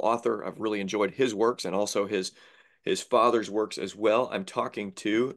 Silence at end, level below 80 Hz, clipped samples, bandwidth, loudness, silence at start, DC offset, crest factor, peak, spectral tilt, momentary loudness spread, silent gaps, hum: 0 s; -78 dBFS; under 0.1%; 12.5 kHz; -28 LUFS; 0 s; under 0.1%; 18 dB; -8 dBFS; -4 dB/octave; 8 LU; none; none